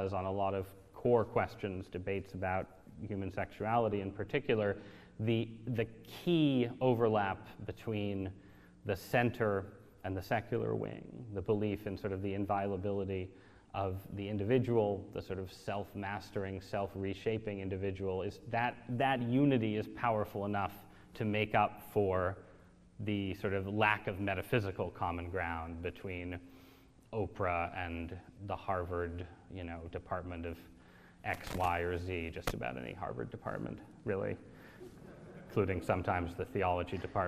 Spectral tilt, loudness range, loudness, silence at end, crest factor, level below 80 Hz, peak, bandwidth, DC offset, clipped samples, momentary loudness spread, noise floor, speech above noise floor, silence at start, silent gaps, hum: -7.5 dB/octave; 6 LU; -36 LUFS; 0 s; 22 dB; -60 dBFS; -14 dBFS; 14.5 kHz; under 0.1%; under 0.1%; 14 LU; -61 dBFS; 25 dB; 0 s; none; none